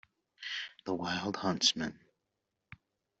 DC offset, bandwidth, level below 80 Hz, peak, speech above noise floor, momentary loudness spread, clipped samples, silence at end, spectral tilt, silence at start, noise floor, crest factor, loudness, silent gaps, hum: under 0.1%; 7.6 kHz; -72 dBFS; -12 dBFS; 52 dB; 12 LU; under 0.1%; 0.45 s; -2 dB/octave; 0.4 s; -85 dBFS; 26 dB; -33 LUFS; none; none